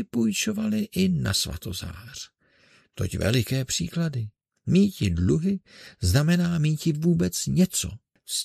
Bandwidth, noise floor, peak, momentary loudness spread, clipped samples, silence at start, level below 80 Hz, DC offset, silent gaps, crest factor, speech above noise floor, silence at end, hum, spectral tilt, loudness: 14 kHz; -60 dBFS; -6 dBFS; 14 LU; under 0.1%; 0 s; -46 dBFS; under 0.1%; none; 18 dB; 35 dB; 0 s; none; -5 dB/octave; -25 LUFS